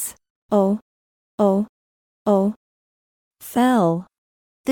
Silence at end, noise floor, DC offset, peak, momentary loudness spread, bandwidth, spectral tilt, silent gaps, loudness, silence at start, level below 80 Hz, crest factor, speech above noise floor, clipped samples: 0 s; under -90 dBFS; under 0.1%; -6 dBFS; 14 LU; 18 kHz; -6.5 dB/octave; 0.30-0.49 s, 0.82-1.38 s, 1.69-2.25 s, 2.56-3.31 s, 4.18-4.64 s; -21 LUFS; 0 s; -66 dBFS; 16 dB; over 72 dB; under 0.1%